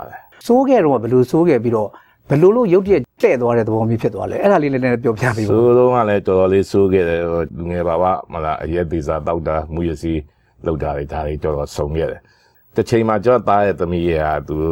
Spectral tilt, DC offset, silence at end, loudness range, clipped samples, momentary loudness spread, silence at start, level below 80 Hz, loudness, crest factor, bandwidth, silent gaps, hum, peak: -8 dB/octave; under 0.1%; 0 s; 7 LU; under 0.1%; 10 LU; 0 s; -36 dBFS; -17 LUFS; 14 dB; 16.5 kHz; none; none; -2 dBFS